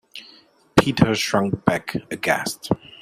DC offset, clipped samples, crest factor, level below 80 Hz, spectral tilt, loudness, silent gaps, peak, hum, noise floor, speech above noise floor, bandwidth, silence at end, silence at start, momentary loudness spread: under 0.1%; under 0.1%; 22 dB; -50 dBFS; -5 dB/octave; -21 LUFS; none; 0 dBFS; none; -52 dBFS; 30 dB; 16 kHz; 0.25 s; 0.15 s; 10 LU